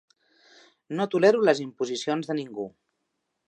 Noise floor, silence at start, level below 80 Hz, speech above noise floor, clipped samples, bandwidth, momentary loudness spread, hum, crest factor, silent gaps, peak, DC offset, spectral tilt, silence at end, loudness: -79 dBFS; 0.9 s; -78 dBFS; 54 dB; under 0.1%; 9.2 kHz; 16 LU; none; 20 dB; none; -6 dBFS; under 0.1%; -5 dB/octave; 0.8 s; -25 LUFS